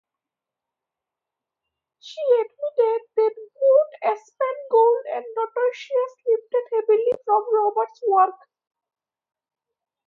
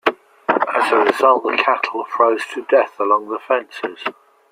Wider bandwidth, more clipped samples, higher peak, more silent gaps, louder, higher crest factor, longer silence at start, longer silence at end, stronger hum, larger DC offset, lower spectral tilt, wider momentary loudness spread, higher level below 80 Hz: second, 7 kHz vs 15.5 kHz; neither; second, -6 dBFS vs -2 dBFS; neither; second, -22 LUFS vs -17 LUFS; about the same, 18 dB vs 16 dB; first, 2.05 s vs 0.05 s; first, 1.7 s vs 0.4 s; neither; neither; about the same, -3.5 dB/octave vs -3.5 dB/octave; about the same, 9 LU vs 11 LU; second, -82 dBFS vs -70 dBFS